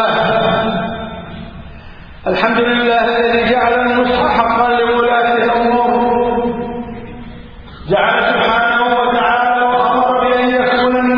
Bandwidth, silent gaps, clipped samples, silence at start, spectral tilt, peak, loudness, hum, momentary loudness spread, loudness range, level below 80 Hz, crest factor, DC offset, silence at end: 5.4 kHz; none; under 0.1%; 0 s; -7.5 dB/octave; 0 dBFS; -13 LUFS; none; 15 LU; 3 LU; -38 dBFS; 14 dB; under 0.1%; 0 s